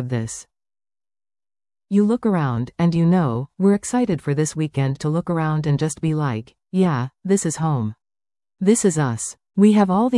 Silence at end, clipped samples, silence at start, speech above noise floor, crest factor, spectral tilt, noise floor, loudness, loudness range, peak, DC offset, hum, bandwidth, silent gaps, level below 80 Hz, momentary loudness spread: 0 s; under 0.1%; 0 s; over 71 dB; 16 dB; -6.5 dB/octave; under -90 dBFS; -20 LUFS; 2 LU; -4 dBFS; under 0.1%; none; 12 kHz; none; -54 dBFS; 9 LU